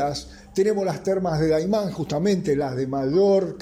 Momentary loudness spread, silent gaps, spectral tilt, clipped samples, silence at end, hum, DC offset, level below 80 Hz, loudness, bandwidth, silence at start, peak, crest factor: 7 LU; none; -6.5 dB/octave; under 0.1%; 0 s; none; under 0.1%; -48 dBFS; -23 LUFS; 15 kHz; 0 s; -10 dBFS; 12 dB